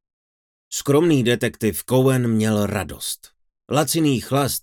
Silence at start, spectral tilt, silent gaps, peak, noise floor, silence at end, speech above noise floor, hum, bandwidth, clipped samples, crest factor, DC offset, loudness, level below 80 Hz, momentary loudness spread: 0.7 s; -5 dB/octave; none; -4 dBFS; under -90 dBFS; 0.05 s; over 71 dB; none; 19.5 kHz; under 0.1%; 16 dB; under 0.1%; -20 LUFS; -54 dBFS; 10 LU